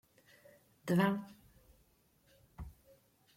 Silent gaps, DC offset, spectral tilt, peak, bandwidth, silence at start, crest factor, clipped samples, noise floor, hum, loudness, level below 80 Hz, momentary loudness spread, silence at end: none; under 0.1%; -7 dB/octave; -18 dBFS; 16.5 kHz; 0.85 s; 24 dB; under 0.1%; -71 dBFS; none; -35 LUFS; -64 dBFS; 22 LU; 0.7 s